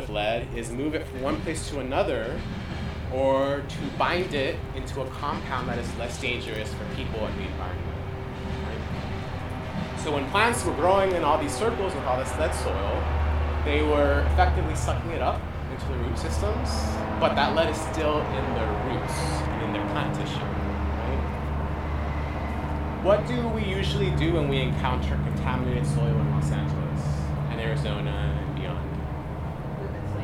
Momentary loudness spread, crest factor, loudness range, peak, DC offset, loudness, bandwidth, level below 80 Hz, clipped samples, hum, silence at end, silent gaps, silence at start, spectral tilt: 10 LU; 20 dB; 6 LU; -6 dBFS; under 0.1%; -27 LUFS; 13 kHz; -34 dBFS; under 0.1%; none; 0 s; none; 0 s; -6 dB/octave